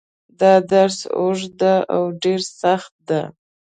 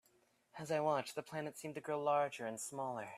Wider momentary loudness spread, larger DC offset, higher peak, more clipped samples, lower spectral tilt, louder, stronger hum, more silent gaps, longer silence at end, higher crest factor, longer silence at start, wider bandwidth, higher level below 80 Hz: about the same, 9 LU vs 10 LU; neither; first, 0 dBFS vs -24 dBFS; neither; about the same, -5 dB/octave vs -4.5 dB/octave; first, -18 LUFS vs -40 LUFS; neither; first, 2.91-2.99 s vs none; first, 0.45 s vs 0 s; about the same, 18 dB vs 18 dB; second, 0.4 s vs 0.55 s; second, 9.4 kHz vs 15.5 kHz; first, -64 dBFS vs -84 dBFS